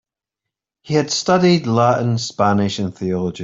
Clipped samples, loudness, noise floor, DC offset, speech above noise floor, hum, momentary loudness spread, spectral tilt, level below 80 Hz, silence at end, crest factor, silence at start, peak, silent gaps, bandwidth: under 0.1%; -17 LUFS; -84 dBFS; under 0.1%; 67 dB; none; 8 LU; -5.5 dB/octave; -56 dBFS; 0 s; 16 dB; 0.85 s; -2 dBFS; none; 7.8 kHz